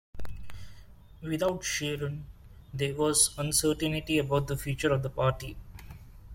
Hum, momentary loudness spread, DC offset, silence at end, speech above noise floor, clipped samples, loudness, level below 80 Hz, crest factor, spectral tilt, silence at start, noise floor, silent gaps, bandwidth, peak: none; 24 LU; under 0.1%; 0 s; 22 dB; under 0.1%; -29 LUFS; -48 dBFS; 20 dB; -4 dB/octave; 0.15 s; -51 dBFS; none; 16.5 kHz; -12 dBFS